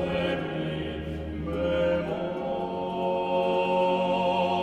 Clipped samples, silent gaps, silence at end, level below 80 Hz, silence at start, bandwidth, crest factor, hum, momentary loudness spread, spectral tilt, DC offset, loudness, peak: under 0.1%; none; 0 s; -48 dBFS; 0 s; 8.8 kHz; 14 dB; none; 8 LU; -7 dB/octave; under 0.1%; -28 LUFS; -14 dBFS